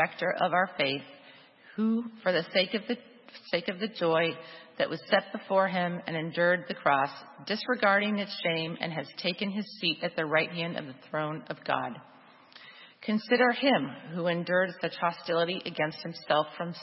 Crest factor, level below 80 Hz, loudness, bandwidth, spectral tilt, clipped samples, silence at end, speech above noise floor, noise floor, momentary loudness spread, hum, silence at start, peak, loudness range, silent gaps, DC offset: 22 dB; -80 dBFS; -29 LUFS; 5.8 kHz; -8.5 dB/octave; under 0.1%; 0 s; 25 dB; -55 dBFS; 11 LU; none; 0 s; -8 dBFS; 3 LU; none; under 0.1%